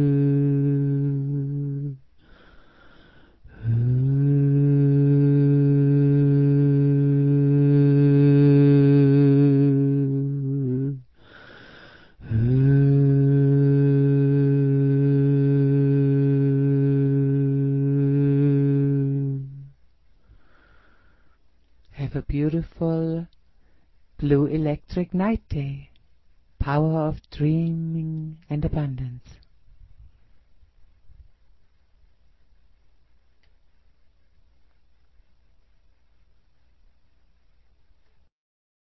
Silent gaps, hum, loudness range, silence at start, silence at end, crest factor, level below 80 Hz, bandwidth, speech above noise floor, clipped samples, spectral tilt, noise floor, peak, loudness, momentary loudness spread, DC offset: none; none; 12 LU; 0 s; 7.85 s; 14 dB; -46 dBFS; 4.7 kHz; 39 dB; under 0.1%; -12.5 dB/octave; -62 dBFS; -8 dBFS; -21 LUFS; 13 LU; 0.2%